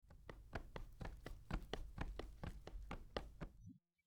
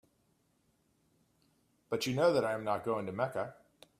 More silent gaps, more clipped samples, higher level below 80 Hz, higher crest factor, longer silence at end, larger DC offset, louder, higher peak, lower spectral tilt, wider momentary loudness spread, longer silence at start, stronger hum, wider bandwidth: neither; neither; first, -54 dBFS vs -76 dBFS; about the same, 24 dB vs 20 dB; second, 0 s vs 0.45 s; neither; second, -54 LUFS vs -33 LUFS; second, -28 dBFS vs -16 dBFS; about the same, -6 dB/octave vs -5.5 dB/octave; about the same, 9 LU vs 11 LU; second, 0 s vs 1.9 s; neither; first, 19 kHz vs 15.5 kHz